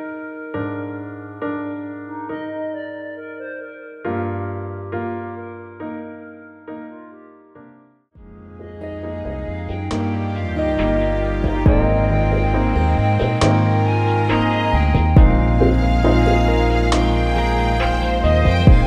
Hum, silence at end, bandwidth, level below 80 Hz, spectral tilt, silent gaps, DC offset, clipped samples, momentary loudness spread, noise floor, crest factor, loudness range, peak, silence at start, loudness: none; 0 s; 9.6 kHz; -22 dBFS; -7.5 dB/octave; none; under 0.1%; under 0.1%; 17 LU; -49 dBFS; 18 dB; 17 LU; 0 dBFS; 0 s; -19 LUFS